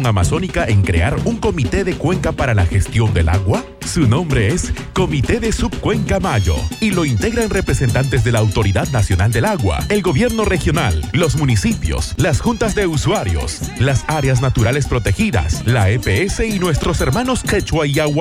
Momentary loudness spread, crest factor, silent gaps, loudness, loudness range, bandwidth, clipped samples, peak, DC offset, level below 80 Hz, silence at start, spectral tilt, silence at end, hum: 3 LU; 12 dB; none; -16 LUFS; 1 LU; 16 kHz; under 0.1%; -2 dBFS; under 0.1%; -26 dBFS; 0 s; -5.5 dB/octave; 0 s; none